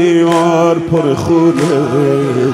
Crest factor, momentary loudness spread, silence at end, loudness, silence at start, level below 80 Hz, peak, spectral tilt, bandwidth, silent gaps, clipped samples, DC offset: 10 dB; 3 LU; 0 s; -12 LUFS; 0 s; -46 dBFS; 0 dBFS; -7 dB/octave; 12.5 kHz; none; under 0.1%; under 0.1%